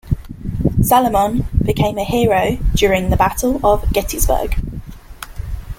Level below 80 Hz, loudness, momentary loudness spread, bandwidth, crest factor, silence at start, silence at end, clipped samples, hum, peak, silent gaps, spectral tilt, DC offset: -24 dBFS; -16 LUFS; 16 LU; 17 kHz; 16 dB; 0.05 s; 0.05 s; under 0.1%; none; -2 dBFS; none; -5.5 dB/octave; under 0.1%